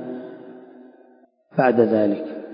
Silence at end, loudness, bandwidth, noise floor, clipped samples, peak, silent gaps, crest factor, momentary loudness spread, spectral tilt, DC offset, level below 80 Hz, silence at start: 0 s; -20 LUFS; 5.4 kHz; -55 dBFS; under 0.1%; -2 dBFS; none; 20 dB; 23 LU; -12 dB/octave; under 0.1%; -72 dBFS; 0 s